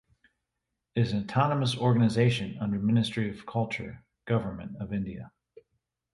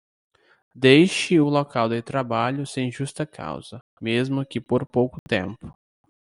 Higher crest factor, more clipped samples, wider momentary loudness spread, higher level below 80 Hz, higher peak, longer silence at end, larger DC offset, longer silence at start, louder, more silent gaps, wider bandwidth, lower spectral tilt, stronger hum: about the same, 18 dB vs 20 dB; neither; second, 14 LU vs 17 LU; about the same, -56 dBFS vs -60 dBFS; second, -12 dBFS vs -2 dBFS; first, 0.85 s vs 0.55 s; neither; first, 0.95 s vs 0.75 s; second, -29 LUFS vs -22 LUFS; second, none vs 3.81-3.97 s, 5.19-5.26 s; about the same, 11.5 kHz vs 11.5 kHz; first, -7 dB/octave vs -5.5 dB/octave; neither